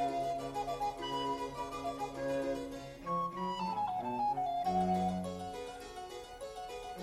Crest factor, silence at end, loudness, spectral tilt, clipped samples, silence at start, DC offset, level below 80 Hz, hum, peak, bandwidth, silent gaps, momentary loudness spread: 16 dB; 0 s; -38 LUFS; -5.5 dB/octave; under 0.1%; 0 s; under 0.1%; -60 dBFS; none; -22 dBFS; 13.5 kHz; none; 12 LU